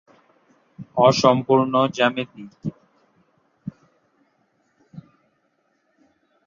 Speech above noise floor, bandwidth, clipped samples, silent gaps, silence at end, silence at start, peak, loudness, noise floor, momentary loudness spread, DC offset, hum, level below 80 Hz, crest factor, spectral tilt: 49 dB; 7.4 kHz; under 0.1%; none; 1.45 s; 0.8 s; -2 dBFS; -20 LUFS; -68 dBFS; 23 LU; under 0.1%; none; -64 dBFS; 22 dB; -5.5 dB/octave